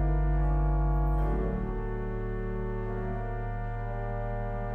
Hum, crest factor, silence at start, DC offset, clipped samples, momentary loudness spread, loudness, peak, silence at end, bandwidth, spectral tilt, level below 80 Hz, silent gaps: none; 12 dB; 0 s; under 0.1%; under 0.1%; 7 LU; -32 LUFS; -18 dBFS; 0 s; 3.2 kHz; -10.5 dB/octave; -30 dBFS; none